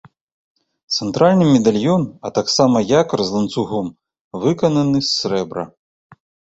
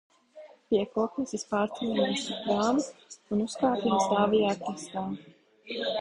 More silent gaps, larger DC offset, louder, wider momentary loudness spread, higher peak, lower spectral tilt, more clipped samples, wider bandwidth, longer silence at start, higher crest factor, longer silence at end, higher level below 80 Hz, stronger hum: first, 4.21-4.31 s vs none; neither; first, -17 LUFS vs -29 LUFS; about the same, 11 LU vs 11 LU; first, -2 dBFS vs -12 dBFS; about the same, -5.5 dB/octave vs -5 dB/octave; neither; second, 8.2 kHz vs 11 kHz; first, 0.9 s vs 0.35 s; about the same, 16 dB vs 18 dB; first, 0.9 s vs 0 s; first, -54 dBFS vs -66 dBFS; neither